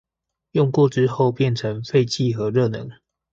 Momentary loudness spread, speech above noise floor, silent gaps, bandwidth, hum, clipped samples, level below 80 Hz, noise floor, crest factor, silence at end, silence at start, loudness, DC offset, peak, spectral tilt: 8 LU; 62 dB; none; 7.8 kHz; none; under 0.1%; -56 dBFS; -81 dBFS; 16 dB; 0.4 s; 0.55 s; -20 LUFS; under 0.1%; -4 dBFS; -7 dB/octave